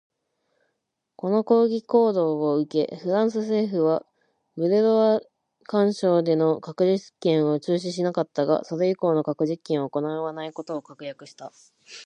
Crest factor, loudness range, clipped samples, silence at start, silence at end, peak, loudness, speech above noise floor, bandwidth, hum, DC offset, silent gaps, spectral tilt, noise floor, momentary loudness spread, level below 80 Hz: 18 dB; 4 LU; under 0.1%; 1.25 s; 0 s; -6 dBFS; -23 LUFS; 56 dB; 9.6 kHz; none; under 0.1%; none; -7 dB/octave; -79 dBFS; 14 LU; -76 dBFS